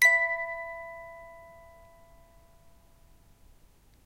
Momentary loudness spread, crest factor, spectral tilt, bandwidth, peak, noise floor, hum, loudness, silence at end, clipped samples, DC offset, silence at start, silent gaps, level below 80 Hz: 27 LU; 24 dB; 0.5 dB/octave; 16 kHz; -8 dBFS; -59 dBFS; none; -28 LUFS; 2.55 s; under 0.1%; under 0.1%; 0 s; none; -60 dBFS